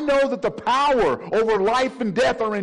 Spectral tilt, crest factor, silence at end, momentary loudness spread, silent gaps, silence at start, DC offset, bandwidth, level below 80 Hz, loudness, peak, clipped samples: -5 dB/octave; 8 dB; 0 s; 4 LU; none; 0 s; under 0.1%; 11 kHz; -48 dBFS; -20 LUFS; -12 dBFS; under 0.1%